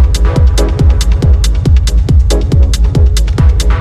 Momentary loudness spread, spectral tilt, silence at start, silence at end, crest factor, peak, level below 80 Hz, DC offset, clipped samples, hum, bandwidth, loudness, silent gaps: 1 LU; -6 dB/octave; 0 s; 0 s; 8 dB; 0 dBFS; -8 dBFS; under 0.1%; under 0.1%; none; 12.5 kHz; -10 LUFS; none